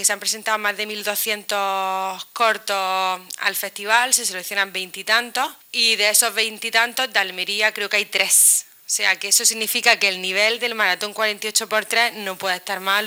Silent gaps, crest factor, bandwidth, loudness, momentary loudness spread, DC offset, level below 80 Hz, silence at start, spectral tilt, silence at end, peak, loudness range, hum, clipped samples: none; 20 dB; 19.5 kHz; -19 LUFS; 9 LU; under 0.1%; -76 dBFS; 0 s; 1 dB/octave; 0 s; 0 dBFS; 5 LU; none; under 0.1%